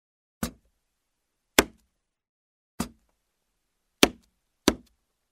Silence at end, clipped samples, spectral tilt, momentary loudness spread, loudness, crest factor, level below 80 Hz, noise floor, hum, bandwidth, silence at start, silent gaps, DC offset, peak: 0.55 s; under 0.1%; -2.5 dB/octave; 14 LU; -27 LUFS; 32 dB; -50 dBFS; -80 dBFS; none; 16 kHz; 0.4 s; 2.29-2.78 s; under 0.1%; 0 dBFS